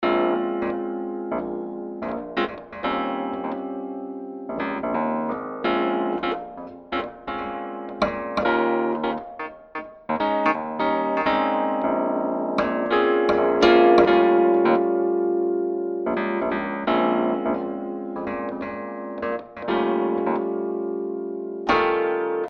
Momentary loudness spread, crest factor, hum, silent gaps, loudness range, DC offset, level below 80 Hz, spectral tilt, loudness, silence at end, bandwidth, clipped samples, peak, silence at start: 13 LU; 20 dB; none; none; 9 LU; under 0.1%; -54 dBFS; -6.5 dB/octave; -23 LUFS; 0 s; 6.8 kHz; under 0.1%; -4 dBFS; 0 s